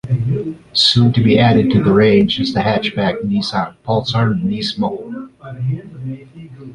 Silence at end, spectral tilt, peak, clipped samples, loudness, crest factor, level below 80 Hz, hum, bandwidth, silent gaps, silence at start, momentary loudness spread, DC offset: 0 s; -6.5 dB/octave; 0 dBFS; under 0.1%; -15 LUFS; 14 dB; -44 dBFS; none; 11 kHz; none; 0.05 s; 18 LU; under 0.1%